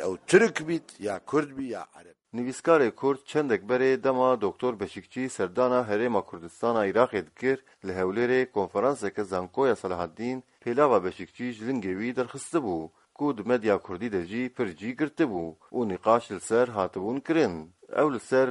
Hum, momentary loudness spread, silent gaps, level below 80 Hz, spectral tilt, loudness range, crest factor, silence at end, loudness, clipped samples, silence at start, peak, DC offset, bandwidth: none; 11 LU; none; -66 dBFS; -5.5 dB/octave; 3 LU; 22 dB; 0 s; -27 LUFS; under 0.1%; 0 s; -4 dBFS; under 0.1%; 11.5 kHz